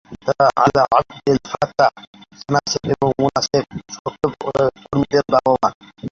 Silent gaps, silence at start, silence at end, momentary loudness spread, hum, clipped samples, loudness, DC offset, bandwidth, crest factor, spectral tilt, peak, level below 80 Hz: 2.07-2.13 s, 3.99-4.05 s, 5.74-5.81 s; 0.1 s; 0.05 s; 9 LU; none; under 0.1%; -18 LUFS; under 0.1%; 7.6 kHz; 16 dB; -5 dB/octave; -2 dBFS; -48 dBFS